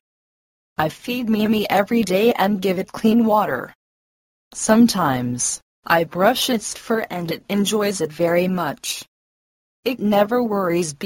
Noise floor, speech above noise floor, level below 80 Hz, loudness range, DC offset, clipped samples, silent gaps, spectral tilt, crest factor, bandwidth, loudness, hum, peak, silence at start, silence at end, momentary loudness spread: under -90 dBFS; over 71 dB; -56 dBFS; 3 LU; under 0.1%; under 0.1%; 3.75-4.51 s, 5.62-5.83 s, 9.08-9.83 s; -4.5 dB/octave; 20 dB; 16.5 kHz; -20 LUFS; none; 0 dBFS; 0.8 s; 0 s; 10 LU